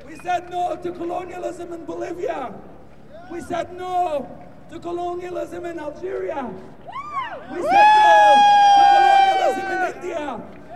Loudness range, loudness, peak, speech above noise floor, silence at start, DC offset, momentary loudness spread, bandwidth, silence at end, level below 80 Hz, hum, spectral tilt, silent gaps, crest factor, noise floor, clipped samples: 15 LU; -18 LUFS; -2 dBFS; 23 dB; 0 s; 0.7%; 21 LU; 11 kHz; 0 s; -54 dBFS; none; -3.5 dB/octave; none; 18 dB; -43 dBFS; under 0.1%